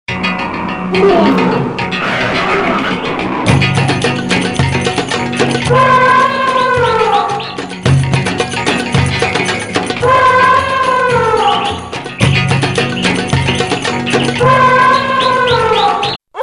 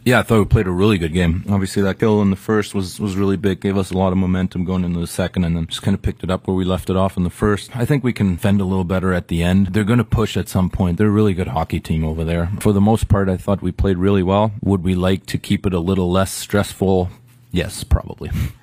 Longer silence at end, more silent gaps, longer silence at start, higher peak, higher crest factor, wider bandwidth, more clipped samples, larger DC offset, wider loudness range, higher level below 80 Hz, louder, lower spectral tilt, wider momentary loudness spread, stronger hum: about the same, 0 s vs 0.1 s; first, 16.16-16.20 s vs none; about the same, 0.1 s vs 0.05 s; about the same, 0 dBFS vs 0 dBFS; second, 12 dB vs 18 dB; second, 11.5 kHz vs 16 kHz; neither; first, 0.4% vs under 0.1%; about the same, 2 LU vs 2 LU; about the same, -36 dBFS vs -32 dBFS; first, -12 LUFS vs -18 LUFS; second, -5 dB/octave vs -7 dB/octave; about the same, 8 LU vs 6 LU; neither